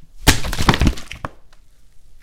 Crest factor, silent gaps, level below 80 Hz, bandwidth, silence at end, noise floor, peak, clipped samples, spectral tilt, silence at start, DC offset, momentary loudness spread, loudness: 20 dB; none; -24 dBFS; 17 kHz; 0.1 s; -43 dBFS; 0 dBFS; under 0.1%; -4 dB/octave; 0 s; under 0.1%; 16 LU; -18 LUFS